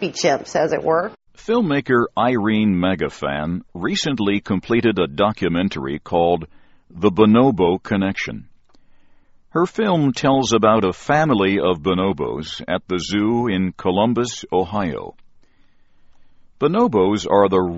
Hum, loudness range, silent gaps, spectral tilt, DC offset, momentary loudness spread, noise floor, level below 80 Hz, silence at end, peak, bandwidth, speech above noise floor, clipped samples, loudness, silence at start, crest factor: none; 4 LU; none; -5 dB/octave; under 0.1%; 9 LU; -51 dBFS; -48 dBFS; 0 s; 0 dBFS; 8 kHz; 33 dB; under 0.1%; -19 LUFS; 0 s; 18 dB